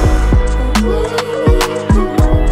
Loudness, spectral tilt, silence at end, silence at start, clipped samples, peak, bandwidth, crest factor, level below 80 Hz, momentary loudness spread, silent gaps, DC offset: -14 LUFS; -6 dB/octave; 0 s; 0 s; under 0.1%; 0 dBFS; 15.5 kHz; 12 dB; -14 dBFS; 3 LU; none; under 0.1%